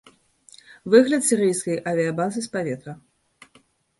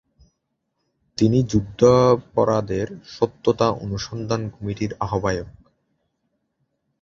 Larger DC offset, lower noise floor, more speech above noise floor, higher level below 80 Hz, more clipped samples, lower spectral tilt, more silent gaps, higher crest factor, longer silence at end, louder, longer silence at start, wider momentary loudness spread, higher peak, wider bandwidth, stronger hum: neither; second, -59 dBFS vs -75 dBFS; second, 39 dB vs 55 dB; second, -66 dBFS vs -46 dBFS; neither; second, -4.5 dB/octave vs -7 dB/octave; neither; about the same, 22 dB vs 20 dB; second, 1.05 s vs 1.5 s; about the same, -21 LUFS vs -21 LUFS; second, 0.85 s vs 1.2 s; first, 16 LU vs 12 LU; about the same, -2 dBFS vs -2 dBFS; first, 12 kHz vs 7.6 kHz; neither